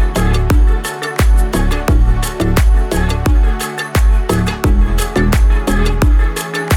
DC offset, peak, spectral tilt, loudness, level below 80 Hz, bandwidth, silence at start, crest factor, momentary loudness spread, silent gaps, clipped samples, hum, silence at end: under 0.1%; 0 dBFS; -5.5 dB/octave; -15 LUFS; -12 dBFS; 16.5 kHz; 0 s; 10 dB; 4 LU; none; under 0.1%; none; 0 s